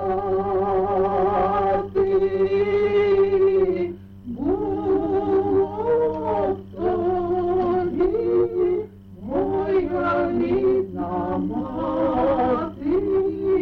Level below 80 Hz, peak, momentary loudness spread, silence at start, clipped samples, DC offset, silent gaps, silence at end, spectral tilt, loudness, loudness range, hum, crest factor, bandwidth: -44 dBFS; -10 dBFS; 7 LU; 0 s; under 0.1%; under 0.1%; none; 0 s; -9.5 dB/octave; -22 LUFS; 3 LU; none; 10 dB; 4.8 kHz